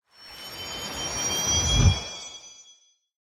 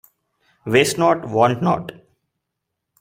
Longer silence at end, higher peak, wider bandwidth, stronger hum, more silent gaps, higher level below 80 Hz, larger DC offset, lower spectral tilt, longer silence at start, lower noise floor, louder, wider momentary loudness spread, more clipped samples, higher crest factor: second, 0.65 s vs 1.1 s; second, -6 dBFS vs 0 dBFS; about the same, 16 kHz vs 16 kHz; neither; neither; first, -36 dBFS vs -58 dBFS; neither; second, -2.5 dB/octave vs -5 dB/octave; second, 0.2 s vs 0.65 s; second, -58 dBFS vs -79 dBFS; second, -24 LUFS vs -18 LUFS; first, 21 LU vs 14 LU; neither; about the same, 22 dB vs 20 dB